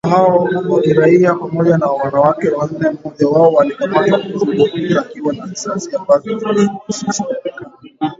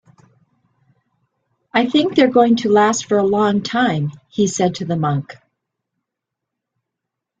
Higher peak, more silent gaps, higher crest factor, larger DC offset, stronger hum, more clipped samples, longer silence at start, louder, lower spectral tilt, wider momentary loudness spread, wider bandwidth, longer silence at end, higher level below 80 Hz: about the same, 0 dBFS vs -2 dBFS; neither; about the same, 14 dB vs 18 dB; neither; neither; neither; second, 0.05 s vs 1.75 s; first, -14 LUFS vs -17 LUFS; about the same, -6 dB/octave vs -5 dB/octave; first, 11 LU vs 8 LU; second, 7.8 kHz vs 9.4 kHz; second, 0.05 s vs 2.1 s; first, -54 dBFS vs -60 dBFS